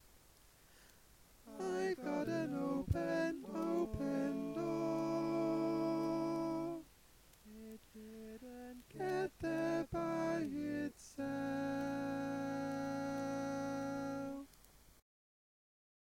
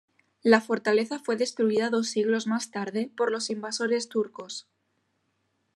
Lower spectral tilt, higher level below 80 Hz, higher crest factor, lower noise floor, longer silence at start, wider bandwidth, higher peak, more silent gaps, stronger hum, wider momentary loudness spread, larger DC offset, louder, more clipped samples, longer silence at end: first, -6.5 dB/octave vs -4 dB/octave; first, -62 dBFS vs -86 dBFS; about the same, 18 dB vs 22 dB; second, -65 dBFS vs -74 dBFS; second, 0.05 s vs 0.45 s; first, 16.5 kHz vs 12 kHz; second, -22 dBFS vs -6 dBFS; neither; neither; first, 15 LU vs 9 LU; neither; second, -40 LUFS vs -27 LUFS; neither; first, 1.55 s vs 1.15 s